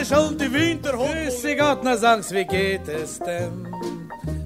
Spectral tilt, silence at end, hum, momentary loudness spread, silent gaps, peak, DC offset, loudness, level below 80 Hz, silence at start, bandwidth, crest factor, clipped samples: -4.5 dB/octave; 0 s; none; 12 LU; none; -4 dBFS; 0.1%; -22 LUFS; -44 dBFS; 0 s; 16 kHz; 18 dB; under 0.1%